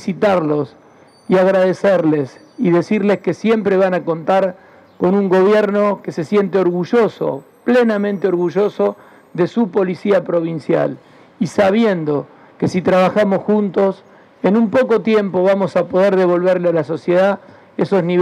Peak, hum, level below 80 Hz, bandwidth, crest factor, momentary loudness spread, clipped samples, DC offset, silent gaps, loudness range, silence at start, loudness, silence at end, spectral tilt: -2 dBFS; none; -62 dBFS; 10.5 kHz; 12 dB; 9 LU; under 0.1%; under 0.1%; none; 2 LU; 0 s; -16 LUFS; 0 s; -7.5 dB/octave